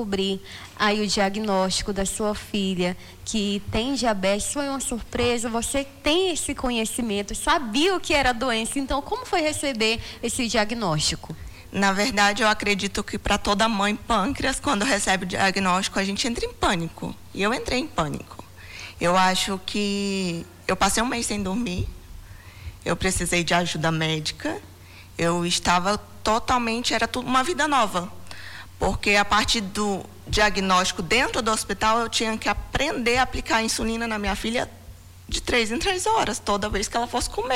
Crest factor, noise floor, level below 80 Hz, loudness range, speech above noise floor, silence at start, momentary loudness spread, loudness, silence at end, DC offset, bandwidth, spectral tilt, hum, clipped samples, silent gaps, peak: 16 dB; -44 dBFS; -40 dBFS; 3 LU; 20 dB; 0 s; 9 LU; -23 LUFS; 0 s; under 0.1%; 19 kHz; -3.5 dB/octave; none; under 0.1%; none; -8 dBFS